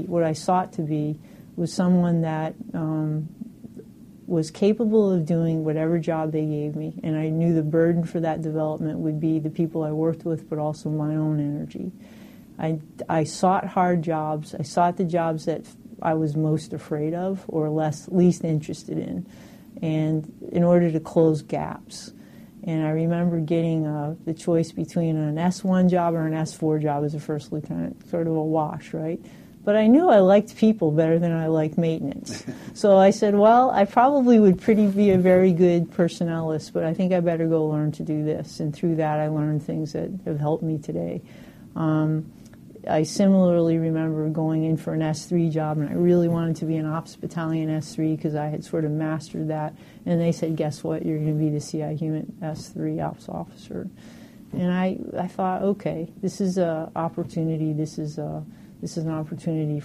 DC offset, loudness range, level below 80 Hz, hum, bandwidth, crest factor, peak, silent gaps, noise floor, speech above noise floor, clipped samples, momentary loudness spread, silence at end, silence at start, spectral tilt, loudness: under 0.1%; 8 LU; -58 dBFS; none; 12.5 kHz; 16 dB; -6 dBFS; none; -45 dBFS; 22 dB; under 0.1%; 13 LU; 0 s; 0 s; -8 dB/octave; -23 LUFS